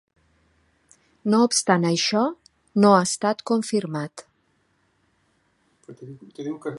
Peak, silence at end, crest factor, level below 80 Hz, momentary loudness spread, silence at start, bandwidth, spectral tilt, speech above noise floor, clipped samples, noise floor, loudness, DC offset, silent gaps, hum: -2 dBFS; 0 s; 22 dB; -70 dBFS; 20 LU; 1.25 s; 11.5 kHz; -4.5 dB/octave; 45 dB; under 0.1%; -67 dBFS; -21 LUFS; under 0.1%; none; none